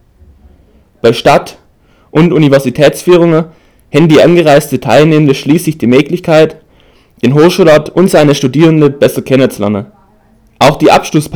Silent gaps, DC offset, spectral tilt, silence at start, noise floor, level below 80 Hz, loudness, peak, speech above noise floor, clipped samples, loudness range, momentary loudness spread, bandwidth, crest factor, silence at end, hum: none; under 0.1%; -6 dB/octave; 1.05 s; -46 dBFS; -40 dBFS; -8 LUFS; 0 dBFS; 39 dB; 5%; 2 LU; 7 LU; over 20 kHz; 8 dB; 0 s; none